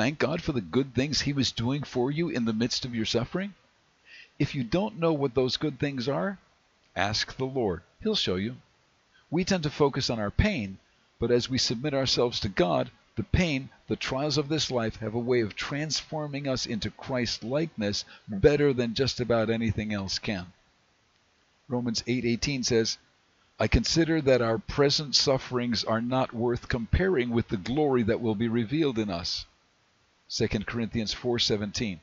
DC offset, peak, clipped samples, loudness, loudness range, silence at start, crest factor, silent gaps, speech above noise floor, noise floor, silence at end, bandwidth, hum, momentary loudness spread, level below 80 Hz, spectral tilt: under 0.1%; -8 dBFS; under 0.1%; -28 LUFS; 5 LU; 0 s; 20 dB; none; 39 dB; -67 dBFS; 0.05 s; 7.8 kHz; none; 8 LU; -44 dBFS; -5 dB/octave